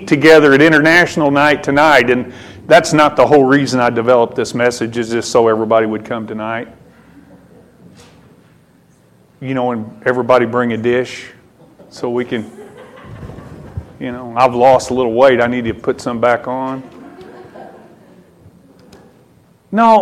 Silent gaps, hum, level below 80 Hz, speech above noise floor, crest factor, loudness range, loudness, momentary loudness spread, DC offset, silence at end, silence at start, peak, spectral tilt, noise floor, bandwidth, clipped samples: none; none; -48 dBFS; 37 dB; 14 dB; 15 LU; -13 LUFS; 20 LU; under 0.1%; 0 s; 0 s; 0 dBFS; -5 dB/octave; -49 dBFS; 16 kHz; under 0.1%